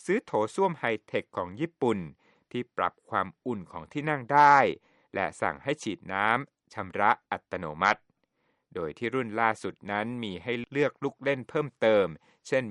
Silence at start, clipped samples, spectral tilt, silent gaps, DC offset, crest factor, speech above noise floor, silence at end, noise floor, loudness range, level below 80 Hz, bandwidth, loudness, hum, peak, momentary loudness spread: 0.05 s; under 0.1%; -5.5 dB/octave; none; under 0.1%; 22 dB; 46 dB; 0 s; -75 dBFS; 5 LU; -70 dBFS; 11.5 kHz; -28 LUFS; none; -8 dBFS; 13 LU